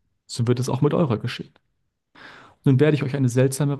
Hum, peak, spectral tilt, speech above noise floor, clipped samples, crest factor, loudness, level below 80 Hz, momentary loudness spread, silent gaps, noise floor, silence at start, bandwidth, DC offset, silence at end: none; -6 dBFS; -7 dB/octave; 42 dB; under 0.1%; 16 dB; -21 LUFS; -62 dBFS; 14 LU; none; -62 dBFS; 0.3 s; 12.5 kHz; under 0.1%; 0 s